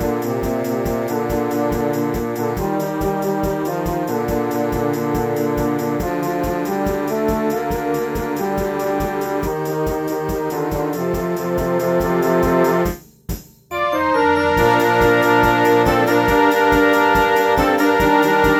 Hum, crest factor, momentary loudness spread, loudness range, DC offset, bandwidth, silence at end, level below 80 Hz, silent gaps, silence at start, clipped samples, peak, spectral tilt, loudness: none; 16 dB; 8 LU; 7 LU; under 0.1%; over 20 kHz; 0 s; -34 dBFS; none; 0 s; under 0.1%; -2 dBFS; -6 dB/octave; -18 LUFS